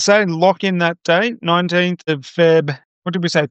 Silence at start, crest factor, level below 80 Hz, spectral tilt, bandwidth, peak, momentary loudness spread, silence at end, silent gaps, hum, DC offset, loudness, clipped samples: 0 s; 14 dB; -70 dBFS; -5 dB/octave; 8.8 kHz; -2 dBFS; 9 LU; 0.05 s; 2.85-3.02 s; none; under 0.1%; -16 LUFS; under 0.1%